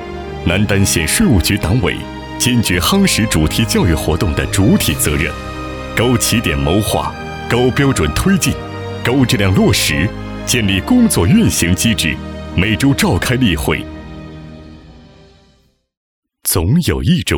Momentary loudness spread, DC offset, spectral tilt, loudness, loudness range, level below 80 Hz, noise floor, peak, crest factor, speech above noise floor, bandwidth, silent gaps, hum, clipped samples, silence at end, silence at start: 12 LU; under 0.1%; -4.5 dB/octave; -14 LUFS; 6 LU; -28 dBFS; -55 dBFS; -2 dBFS; 14 dB; 41 dB; over 20 kHz; 15.97-16.23 s; none; under 0.1%; 0 s; 0 s